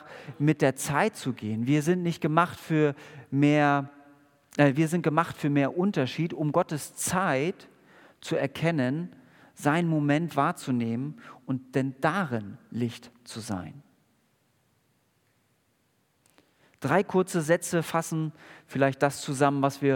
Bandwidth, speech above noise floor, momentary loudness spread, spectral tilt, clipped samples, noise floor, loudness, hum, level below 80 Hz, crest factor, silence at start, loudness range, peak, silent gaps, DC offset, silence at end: 18 kHz; 44 dB; 12 LU; -6 dB/octave; under 0.1%; -70 dBFS; -27 LUFS; none; -72 dBFS; 24 dB; 0 s; 9 LU; -4 dBFS; none; under 0.1%; 0 s